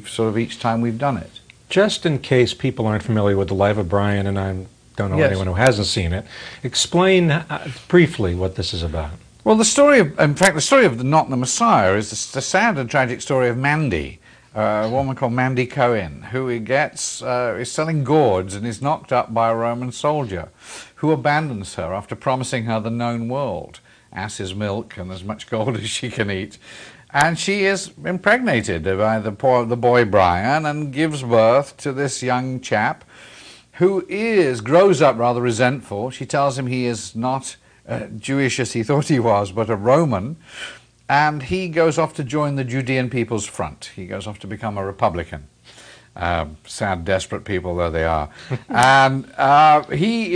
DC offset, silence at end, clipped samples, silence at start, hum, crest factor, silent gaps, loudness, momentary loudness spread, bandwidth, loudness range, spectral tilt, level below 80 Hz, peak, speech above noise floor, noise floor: under 0.1%; 0 s; under 0.1%; 0 s; none; 20 dB; none; -19 LUFS; 14 LU; 11 kHz; 8 LU; -5 dB/octave; -44 dBFS; 0 dBFS; 26 dB; -45 dBFS